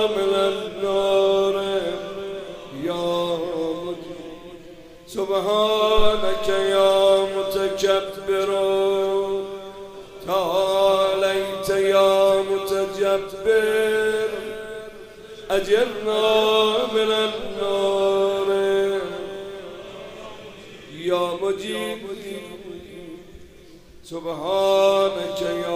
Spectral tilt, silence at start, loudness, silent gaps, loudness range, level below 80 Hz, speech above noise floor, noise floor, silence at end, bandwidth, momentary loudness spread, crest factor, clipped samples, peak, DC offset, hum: -4 dB/octave; 0 s; -21 LUFS; none; 9 LU; -44 dBFS; 26 dB; -46 dBFS; 0 s; 15.5 kHz; 20 LU; 18 dB; under 0.1%; -4 dBFS; under 0.1%; none